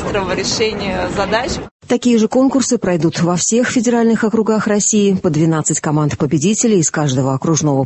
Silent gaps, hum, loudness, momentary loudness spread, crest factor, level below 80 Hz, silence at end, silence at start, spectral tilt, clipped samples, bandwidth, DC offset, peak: 1.71-1.80 s; none; -15 LUFS; 5 LU; 12 dB; -40 dBFS; 0 s; 0 s; -4.5 dB/octave; under 0.1%; 8.6 kHz; under 0.1%; -2 dBFS